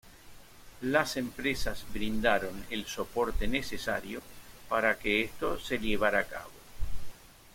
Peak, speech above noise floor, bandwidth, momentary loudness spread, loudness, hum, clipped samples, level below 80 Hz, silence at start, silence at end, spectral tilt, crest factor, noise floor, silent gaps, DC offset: -10 dBFS; 21 dB; 16.5 kHz; 16 LU; -31 LUFS; none; under 0.1%; -44 dBFS; 0.05 s; 0.05 s; -4 dB/octave; 20 dB; -51 dBFS; none; under 0.1%